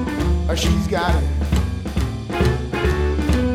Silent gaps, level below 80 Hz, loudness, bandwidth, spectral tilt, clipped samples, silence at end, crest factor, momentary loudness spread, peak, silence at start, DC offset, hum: none; -22 dBFS; -21 LUFS; 14 kHz; -6 dB/octave; under 0.1%; 0 s; 14 dB; 5 LU; -4 dBFS; 0 s; under 0.1%; none